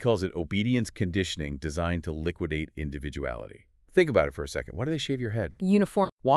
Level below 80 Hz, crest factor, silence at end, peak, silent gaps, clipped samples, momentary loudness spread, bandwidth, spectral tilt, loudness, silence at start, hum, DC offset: -44 dBFS; 22 dB; 0 s; -6 dBFS; 6.12-6.17 s; under 0.1%; 11 LU; 12.5 kHz; -6 dB/octave; -29 LUFS; 0 s; none; under 0.1%